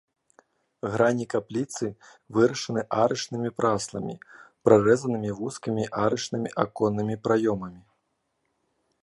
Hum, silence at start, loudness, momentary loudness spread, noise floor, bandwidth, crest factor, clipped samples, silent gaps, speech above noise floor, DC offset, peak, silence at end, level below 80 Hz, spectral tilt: none; 0.85 s; -26 LUFS; 11 LU; -76 dBFS; 11.5 kHz; 22 dB; under 0.1%; none; 50 dB; under 0.1%; -4 dBFS; 1.25 s; -62 dBFS; -5.5 dB/octave